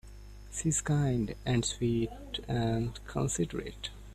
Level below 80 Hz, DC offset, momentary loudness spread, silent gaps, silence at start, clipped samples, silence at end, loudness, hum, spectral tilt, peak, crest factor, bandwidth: -48 dBFS; under 0.1%; 12 LU; none; 0.05 s; under 0.1%; 0 s; -32 LUFS; 50 Hz at -45 dBFS; -5 dB/octave; -18 dBFS; 16 dB; 14 kHz